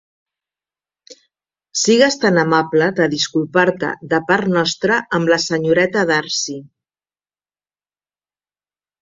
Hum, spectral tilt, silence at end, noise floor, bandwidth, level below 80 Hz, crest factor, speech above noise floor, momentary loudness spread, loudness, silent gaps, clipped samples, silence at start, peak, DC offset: 50 Hz at -50 dBFS; -4 dB/octave; 2.35 s; under -90 dBFS; 7.8 kHz; -60 dBFS; 18 dB; over 74 dB; 8 LU; -16 LUFS; none; under 0.1%; 1.1 s; -2 dBFS; under 0.1%